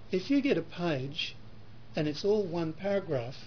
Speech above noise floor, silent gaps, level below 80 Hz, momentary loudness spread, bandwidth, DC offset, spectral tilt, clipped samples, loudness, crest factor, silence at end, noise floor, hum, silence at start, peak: 21 dB; none; -60 dBFS; 8 LU; 5.4 kHz; 0.5%; -6.5 dB/octave; under 0.1%; -32 LUFS; 16 dB; 0 s; -52 dBFS; none; 0 s; -16 dBFS